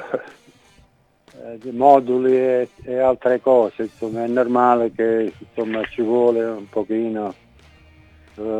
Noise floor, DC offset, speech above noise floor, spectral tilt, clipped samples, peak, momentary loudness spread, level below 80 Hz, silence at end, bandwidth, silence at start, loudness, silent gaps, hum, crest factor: -56 dBFS; under 0.1%; 37 dB; -7.5 dB/octave; under 0.1%; 0 dBFS; 14 LU; -58 dBFS; 0 s; 9 kHz; 0 s; -19 LUFS; none; none; 20 dB